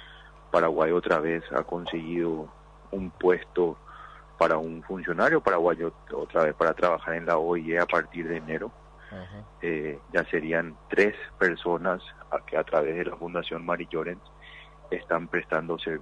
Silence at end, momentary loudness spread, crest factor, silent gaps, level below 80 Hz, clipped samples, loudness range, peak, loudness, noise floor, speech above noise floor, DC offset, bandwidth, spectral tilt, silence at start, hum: 0 s; 18 LU; 18 dB; none; -54 dBFS; under 0.1%; 5 LU; -10 dBFS; -27 LUFS; -49 dBFS; 22 dB; under 0.1%; 10 kHz; -6.5 dB/octave; 0 s; none